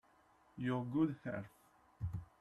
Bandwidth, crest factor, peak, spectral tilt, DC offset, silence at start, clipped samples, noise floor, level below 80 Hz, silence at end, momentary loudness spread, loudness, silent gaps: 12.5 kHz; 18 dB; -24 dBFS; -9 dB/octave; under 0.1%; 0.55 s; under 0.1%; -70 dBFS; -64 dBFS; 0.15 s; 15 LU; -41 LUFS; none